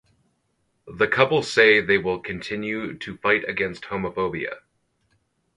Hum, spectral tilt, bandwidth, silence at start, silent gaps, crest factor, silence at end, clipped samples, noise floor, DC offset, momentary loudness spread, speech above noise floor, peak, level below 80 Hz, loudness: none; -5 dB/octave; 11.5 kHz; 0.85 s; none; 24 dB; 1 s; under 0.1%; -71 dBFS; under 0.1%; 14 LU; 48 dB; 0 dBFS; -56 dBFS; -22 LUFS